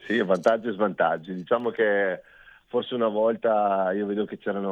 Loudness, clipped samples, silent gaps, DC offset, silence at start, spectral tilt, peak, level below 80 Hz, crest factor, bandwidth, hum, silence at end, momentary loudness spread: -25 LUFS; under 0.1%; none; under 0.1%; 0 s; -6.5 dB/octave; -6 dBFS; -70 dBFS; 18 dB; 8.8 kHz; none; 0 s; 7 LU